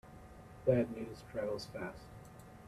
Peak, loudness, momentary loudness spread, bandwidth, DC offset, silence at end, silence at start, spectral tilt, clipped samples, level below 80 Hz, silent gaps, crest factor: -18 dBFS; -38 LUFS; 22 LU; 14.5 kHz; under 0.1%; 0 s; 0.05 s; -7 dB/octave; under 0.1%; -60 dBFS; none; 22 dB